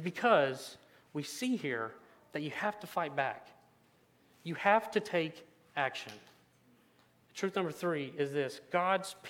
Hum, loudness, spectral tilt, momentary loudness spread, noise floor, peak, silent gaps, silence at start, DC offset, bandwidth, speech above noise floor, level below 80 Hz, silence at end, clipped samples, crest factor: none; -34 LUFS; -4.5 dB/octave; 16 LU; -68 dBFS; -12 dBFS; none; 0 s; under 0.1%; 17.5 kHz; 34 dB; -84 dBFS; 0 s; under 0.1%; 24 dB